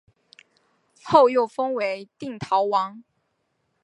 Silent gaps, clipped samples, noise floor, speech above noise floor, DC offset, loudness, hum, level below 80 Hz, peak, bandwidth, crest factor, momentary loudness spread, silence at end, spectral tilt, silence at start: none; under 0.1%; -73 dBFS; 51 dB; under 0.1%; -22 LUFS; none; -68 dBFS; -2 dBFS; 11 kHz; 22 dB; 16 LU; 0.85 s; -5.5 dB/octave; 1.05 s